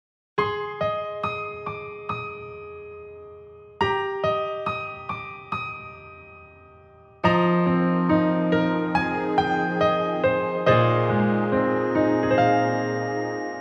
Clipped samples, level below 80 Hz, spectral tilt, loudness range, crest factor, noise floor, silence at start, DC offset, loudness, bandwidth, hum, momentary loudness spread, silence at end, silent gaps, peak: under 0.1%; -54 dBFS; -8 dB/octave; 9 LU; 18 dB; -50 dBFS; 0.35 s; under 0.1%; -23 LUFS; 7 kHz; none; 18 LU; 0 s; none; -6 dBFS